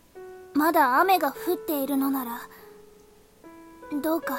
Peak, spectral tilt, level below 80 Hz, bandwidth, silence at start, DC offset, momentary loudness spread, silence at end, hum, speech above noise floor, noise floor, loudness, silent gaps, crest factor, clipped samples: -10 dBFS; -3.5 dB/octave; -64 dBFS; 16.5 kHz; 0.15 s; under 0.1%; 24 LU; 0 s; none; 30 dB; -55 dBFS; -25 LUFS; none; 16 dB; under 0.1%